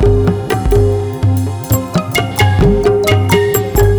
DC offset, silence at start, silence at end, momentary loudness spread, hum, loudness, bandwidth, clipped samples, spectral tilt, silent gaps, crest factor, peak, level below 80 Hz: under 0.1%; 0 s; 0 s; 5 LU; none; -13 LUFS; over 20 kHz; under 0.1%; -6 dB/octave; none; 10 dB; -2 dBFS; -20 dBFS